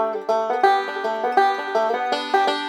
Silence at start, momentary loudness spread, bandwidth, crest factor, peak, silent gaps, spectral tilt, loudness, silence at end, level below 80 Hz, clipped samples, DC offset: 0 s; 4 LU; 19.5 kHz; 18 dB; -4 dBFS; none; -2.5 dB/octave; -21 LUFS; 0 s; -82 dBFS; under 0.1%; under 0.1%